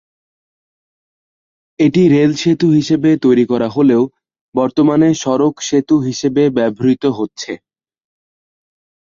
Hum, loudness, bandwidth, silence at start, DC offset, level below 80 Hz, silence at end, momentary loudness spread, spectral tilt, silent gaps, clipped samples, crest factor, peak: none; -14 LUFS; 7.6 kHz; 1.8 s; under 0.1%; -54 dBFS; 1.45 s; 10 LU; -6.5 dB/octave; 4.41-4.52 s; under 0.1%; 14 dB; -2 dBFS